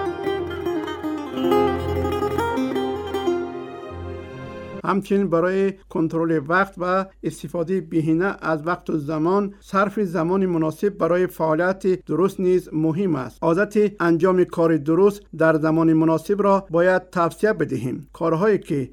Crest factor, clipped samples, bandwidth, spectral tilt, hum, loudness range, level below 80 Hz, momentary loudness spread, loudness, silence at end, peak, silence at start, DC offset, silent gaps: 16 dB; under 0.1%; 17 kHz; -7.5 dB/octave; none; 5 LU; -50 dBFS; 9 LU; -21 LUFS; 0.05 s; -4 dBFS; 0 s; under 0.1%; none